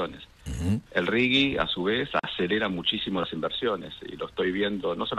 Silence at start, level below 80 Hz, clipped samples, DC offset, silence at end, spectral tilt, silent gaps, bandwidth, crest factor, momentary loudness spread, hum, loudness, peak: 0 s; -50 dBFS; under 0.1%; under 0.1%; 0 s; -5.5 dB/octave; none; 13 kHz; 20 dB; 13 LU; none; -27 LUFS; -8 dBFS